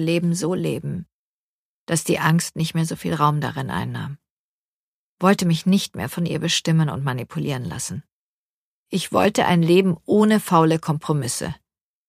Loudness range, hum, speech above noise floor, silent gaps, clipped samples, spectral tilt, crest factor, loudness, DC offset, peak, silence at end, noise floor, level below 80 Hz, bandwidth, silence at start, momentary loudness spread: 4 LU; none; over 70 dB; 1.13-1.87 s, 4.30-5.18 s, 8.12-8.86 s; under 0.1%; -5.5 dB/octave; 20 dB; -21 LUFS; under 0.1%; -2 dBFS; 0.55 s; under -90 dBFS; -56 dBFS; 15.5 kHz; 0 s; 12 LU